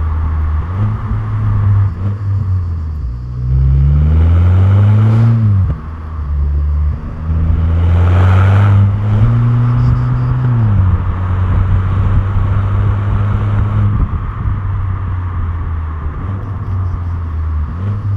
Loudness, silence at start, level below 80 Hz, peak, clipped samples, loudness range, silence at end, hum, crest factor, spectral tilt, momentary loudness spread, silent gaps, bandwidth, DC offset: -14 LUFS; 0 s; -20 dBFS; 0 dBFS; under 0.1%; 7 LU; 0 s; none; 12 dB; -10 dB/octave; 11 LU; none; 3.9 kHz; under 0.1%